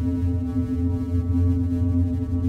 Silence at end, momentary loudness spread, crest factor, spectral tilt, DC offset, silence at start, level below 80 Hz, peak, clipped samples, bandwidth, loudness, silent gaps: 0 s; 3 LU; 10 dB; -10.5 dB/octave; under 0.1%; 0 s; -32 dBFS; -12 dBFS; under 0.1%; 3.2 kHz; -24 LUFS; none